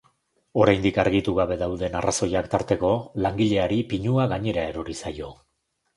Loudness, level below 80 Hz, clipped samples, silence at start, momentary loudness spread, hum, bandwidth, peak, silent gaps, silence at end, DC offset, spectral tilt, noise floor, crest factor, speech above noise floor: -24 LUFS; -44 dBFS; under 0.1%; 0.55 s; 11 LU; none; 11.5 kHz; -6 dBFS; none; 0.65 s; under 0.1%; -5.5 dB/octave; -66 dBFS; 18 dB; 43 dB